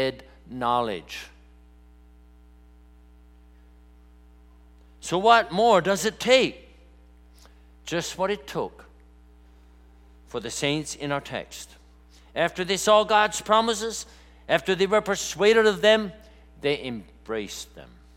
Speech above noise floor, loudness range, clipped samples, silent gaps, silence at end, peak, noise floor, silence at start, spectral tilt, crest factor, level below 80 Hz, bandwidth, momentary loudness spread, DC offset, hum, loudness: 29 dB; 11 LU; under 0.1%; none; 0.3 s; -4 dBFS; -52 dBFS; 0 s; -3.5 dB/octave; 22 dB; -52 dBFS; 16.5 kHz; 20 LU; under 0.1%; 60 Hz at -50 dBFS; -23 LUFS